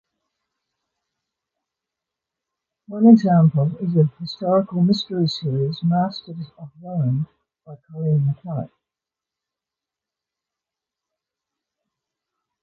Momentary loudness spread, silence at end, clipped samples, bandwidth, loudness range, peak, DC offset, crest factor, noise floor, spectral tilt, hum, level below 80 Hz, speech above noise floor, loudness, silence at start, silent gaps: 22 LU; 3.95 s; under 0.1%; 7 kHz; 10 LU; -2 dBFS; under 0.1%; 22 dB; -88 dBFS; -9 dB/octave; none; -62 dBFS; 69 dB; -20 LUFS; 2.9 s; none